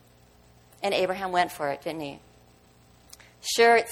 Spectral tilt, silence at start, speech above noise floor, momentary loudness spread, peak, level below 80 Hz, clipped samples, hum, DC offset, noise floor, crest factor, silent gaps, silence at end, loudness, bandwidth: -2.5 dB/octave; 0.8 s; 32 dB; 17 LU; -8 dBFS; -62 dBFS; under 0.1%; 60 Hz at -60 dBFS; under 0.1%; -57 dBFS; 20 dB; none; 0 s; -26 LUFS; 17 kHz